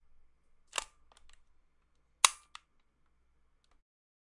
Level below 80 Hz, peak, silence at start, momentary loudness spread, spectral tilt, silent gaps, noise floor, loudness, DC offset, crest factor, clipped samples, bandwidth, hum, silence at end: -68 dBFS; -4 dBFS; 2.25 s; 23 LU; 3.5 dB/octave; none; -71 dBFS; -31 LUFS; under 0.1%; 36 dB; under 0.1%; 11.5 kHz; none; 2 s